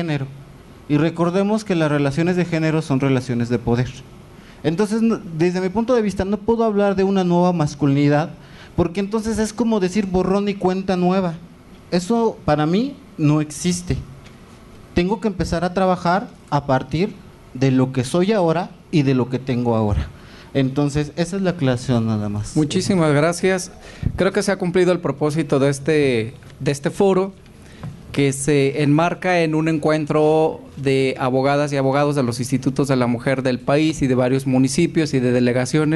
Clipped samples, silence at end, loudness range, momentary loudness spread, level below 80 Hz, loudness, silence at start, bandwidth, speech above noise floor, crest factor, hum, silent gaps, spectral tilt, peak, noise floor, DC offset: under 0.1%; 0 s; 3 LU; 7 LU; -42 dBFS; -19 LUFS; 0 s; 12 kHz; 24 dB; 12 dB; none; none; -6.5 dB/octave; -6 dBFS; -42 dBFS; under 0.1%